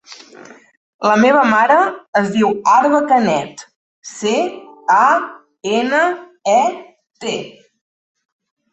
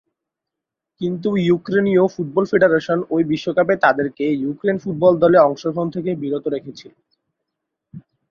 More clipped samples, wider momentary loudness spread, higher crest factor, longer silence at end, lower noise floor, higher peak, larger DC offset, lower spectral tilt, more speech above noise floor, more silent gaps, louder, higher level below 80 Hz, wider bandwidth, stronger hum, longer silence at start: neither; first, 16 LU vs 9 LU; about the same, 16 dB vs 18 dB; first, 1.25 s vs 0.3 s; second, -41 dBFS vs -84 dBFS; about the same, -2 dBFS vs -2 dBFS; neither; second, -4.5 dB/octave vs -7.5 dB/octave; second, 27 dB vs 66 dB; first, 0.77-0.99 s, 2.08-2.13 s, 3.76-4.02 s vs none; first, -15 LUFS vs -18 LUFS; about the same, -62 dBFS vs -60 dBFS; first, 8.4 kHz vs 7 kHz; neither; second, 0.1 s vs 1 s